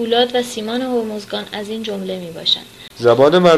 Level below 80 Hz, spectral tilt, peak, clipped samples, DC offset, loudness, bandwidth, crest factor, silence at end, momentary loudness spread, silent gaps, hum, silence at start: -56 dBFS; -5 dB/octave; 0 dBFS; under 0.1%; under 0.1%; -18 LUFS; 14 kHz; 16 dB; 0 s; 13 LU; none; none; 0 s